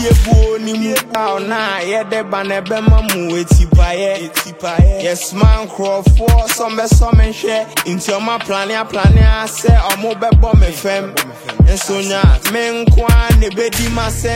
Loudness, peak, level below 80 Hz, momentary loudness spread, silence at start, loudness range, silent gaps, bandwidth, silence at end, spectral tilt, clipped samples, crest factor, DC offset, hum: -14 LUFS; 0 dBFS; -14 dBFS; 7 LU; 0 s; 2 LU; none; 16.5 kHz; 0 s; -5.5 dB/octave; under 0.1%; 12 dB; under 0.1%; none